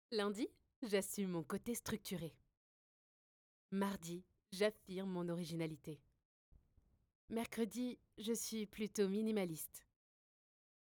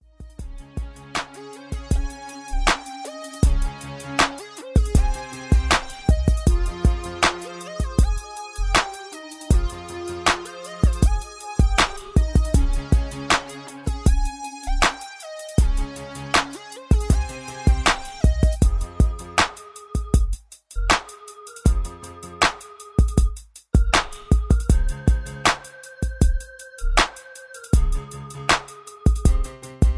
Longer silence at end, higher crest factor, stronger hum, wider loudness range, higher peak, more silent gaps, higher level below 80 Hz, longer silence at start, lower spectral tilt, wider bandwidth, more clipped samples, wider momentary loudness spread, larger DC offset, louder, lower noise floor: first, 1.1 s vs 0 s; about the same, 20 dB vs 18 dB; neither; about the same, 4 LU vs 3 LU; second, -26 dBFS vs -4 dBFS; first, 0.76-0.82 s, 2.57-3.69 s, 6.25-6.52 s, 7.15-7.28 s vs none; second, -76 dBFS vs -24 dBFS; about the same, 0.1 s vs 0.2 s; about the same, -5 dB/octave vs -4.5 dB/octave; first, over 20 kHz vs 11 kHz; neither; second, 12 LU vs 15 LU; neither; second, -43 LUFS vs -23 LUFS; first, -76 dBFS vs -41 dBFS